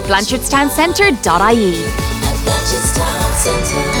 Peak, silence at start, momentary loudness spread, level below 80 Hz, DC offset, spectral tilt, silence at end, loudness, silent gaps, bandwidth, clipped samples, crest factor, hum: 0 dBFS; 0 s; 6 LU; -24 dBFS; under 0.1%; -3.5 dB/octave; 0 s; -14 LUFS; none; over 20 kHz; under 0.1%; 14 dB; none